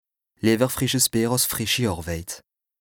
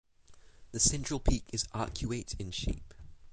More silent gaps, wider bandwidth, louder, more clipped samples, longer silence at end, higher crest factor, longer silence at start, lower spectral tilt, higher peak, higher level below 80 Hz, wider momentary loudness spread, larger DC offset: neither; first, over 20 kHz vs 9.6 kHz; first, -22 LUFS vs -34 LUFS; neither; first, 0.45 s vs 0 s; about the same, 18 dB vs 22 dB; first, 0.45 s vs 0.3 s; about the same, -3.5 dB/octave vs -3.5 dB/octave; first, -6 dBFS vs -12 dBFS; second, -48 dBFS vs -40 dBFS; about the same, 12 LU vs 11 LU; neither